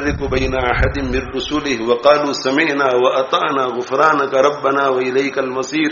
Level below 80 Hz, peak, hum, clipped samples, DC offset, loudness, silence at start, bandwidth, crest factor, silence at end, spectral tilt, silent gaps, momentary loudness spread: -32 dBFS; 0 dBFS; none; under 0.1%; under 0.1%; -16 LUFS; 0 s; 7.2 kHz; 16 dB; 0 s; -3.5 dB/octave; none; 6 LU